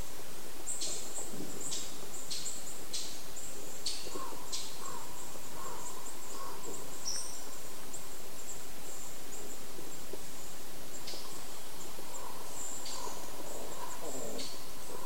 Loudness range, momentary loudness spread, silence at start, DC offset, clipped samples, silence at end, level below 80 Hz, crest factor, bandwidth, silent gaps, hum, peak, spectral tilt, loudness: 5 LU; 7 LU; 0 s; 4%; under 0.1%; 0 s; -62 dBFS; 22 dB; 16 kHz; none; none; -18 dBFS; -2 dB/octave; -42 LUFS